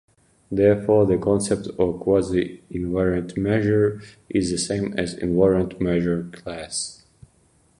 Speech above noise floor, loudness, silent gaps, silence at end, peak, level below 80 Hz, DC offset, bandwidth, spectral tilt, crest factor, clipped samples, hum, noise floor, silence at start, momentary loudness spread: 39 dB; -22 LUFS; none; 0.85 s; -6 dBFS; -44 dBFS; under 0.1%; 11.5 kHz; -6 dB/octave; 16 dB; under 0.1%; none; -60 dBFS; 0.5 s; 11 LU